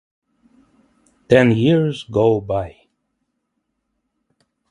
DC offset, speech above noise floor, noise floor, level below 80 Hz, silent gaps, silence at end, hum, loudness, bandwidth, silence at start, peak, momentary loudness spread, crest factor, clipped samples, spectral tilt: under 0.1%; 58 dB; -74 dBFS; -50 dBFS; none; 2 s; none; -17 LUFS; 11 kHz; 1.3 s; 0 dBFS; 11 LU; 20 dB; under 0.1%; -7.5 dB/octave